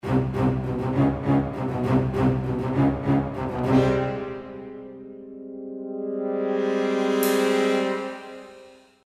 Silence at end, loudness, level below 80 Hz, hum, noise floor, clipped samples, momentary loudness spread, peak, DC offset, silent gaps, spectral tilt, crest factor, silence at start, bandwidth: 0.3 s; -24 LUFS; -44 dBFS; none; -49 dBFS; under 0.1%; 18 LU; -8 dBFS; under 0.1%; none; -7 dB/octave; 16 dB; 0.05 s; 15 kHz